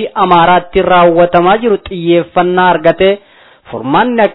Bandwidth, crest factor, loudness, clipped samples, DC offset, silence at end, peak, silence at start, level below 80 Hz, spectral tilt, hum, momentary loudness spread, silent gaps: 5.4 kHz; 10 dB; -9 LUFS; 0.3%; under 0.1%; 0 s; 0 dBFS; 0 s; -38 dBFS; -9.5 dB/octave; none; 7 LU; none